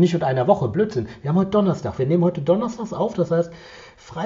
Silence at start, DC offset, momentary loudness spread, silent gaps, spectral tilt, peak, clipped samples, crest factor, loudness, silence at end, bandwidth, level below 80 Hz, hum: 0 s; under 0.1%; 9 LU; none; -7.5 dB/octave; -2 dBFS; under 0.1%; 18 dB; -21 LUFS; 0 s; 7.6 kHz; -52 dBFS; none